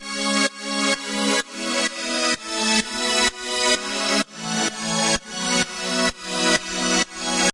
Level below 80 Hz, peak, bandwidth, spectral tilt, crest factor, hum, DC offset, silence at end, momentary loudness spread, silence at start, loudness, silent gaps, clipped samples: -50 dBFS; -4 dBFS; 11.5 kHz; -1.5 dB/octave; 18 dB; none; under 0.1%; 0 s; 3 LU; 0 s; -21 LUFS; none; under 0.1%